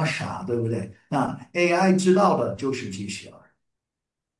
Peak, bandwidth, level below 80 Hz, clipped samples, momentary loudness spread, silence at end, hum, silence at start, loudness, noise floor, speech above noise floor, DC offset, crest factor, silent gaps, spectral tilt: -8 dBFS; 11.5 kHz; -64 dBFS; under 0.1%; 13 LU; 1.1 s; none; 0 s; -24 LUFS; -86 dBFS; 63 dB; under 0.1%; 16 dB; none; -6 dB/octave